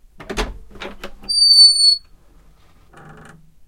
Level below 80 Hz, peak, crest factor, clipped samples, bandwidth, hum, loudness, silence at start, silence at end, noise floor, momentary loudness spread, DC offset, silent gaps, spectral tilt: -38 dBFS; 0 dBFS; 18 dB; under 0.1%; 15 kHz; none; -9 LUFS; 0.3 s; 1.7 s; -49 dBFS; 27 LU; 0.2%; none; 0 dB/octave